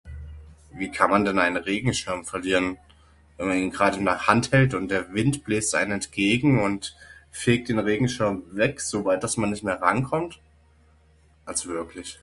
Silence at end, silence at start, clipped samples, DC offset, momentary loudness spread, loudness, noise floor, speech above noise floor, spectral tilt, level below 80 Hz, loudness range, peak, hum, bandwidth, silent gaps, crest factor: 0.1 s; 0.05 s; under 0.1%; under 0.1%; 12 LU; -24 LUFS; -58 dBFS; 34 dB; -5 dB/octave; -48 dBFS; 4 LU; -2 dBFS; none; 11.5 kHz; none; 24 dB